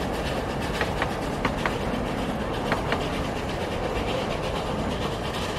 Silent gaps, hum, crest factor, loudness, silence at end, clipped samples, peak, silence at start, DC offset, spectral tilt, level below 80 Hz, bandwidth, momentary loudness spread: none; none; 20 dB; -28 LUFS; 0 s; under 0.1%; -8 dBFS; 0 s; under 0.1%; -5.5 dB/octave; -38 dBFS; 15.5 kHz; 2 LU